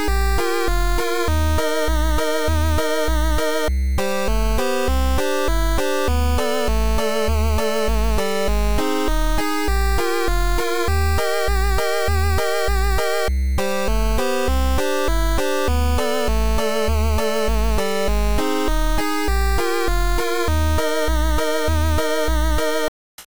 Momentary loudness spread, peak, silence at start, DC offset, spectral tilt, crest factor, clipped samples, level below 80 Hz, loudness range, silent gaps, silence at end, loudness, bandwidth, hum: 2 LU; -10 dBFS; 0 s; 6%; -5 dB/octave; 10 dB; under 0.1%; -22 dBFS; 0 LU; 22.88-23.18 s; 0.15 s; -21 LUFS; over 20 kHz; none